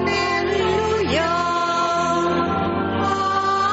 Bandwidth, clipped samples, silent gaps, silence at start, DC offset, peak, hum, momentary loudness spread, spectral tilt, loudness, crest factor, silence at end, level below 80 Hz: 8 kHz; under 0.1%; none; 0 s; under 0.1%; -8 dBFS; none; 2 LU; -3.5 dB/octave; -20 LUFS; 12 dB; 0 s; -44 dBFS